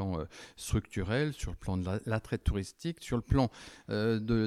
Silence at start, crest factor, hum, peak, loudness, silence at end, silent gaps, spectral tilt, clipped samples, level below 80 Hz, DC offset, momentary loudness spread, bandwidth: 0 s; 18 dB; none; -14 dBFS; -34 LUFS; 0 s; none; -6.5 dB/octave; under 0.1%; -44 dBFS; under 0.1%; 9 LU; 14.5 kHz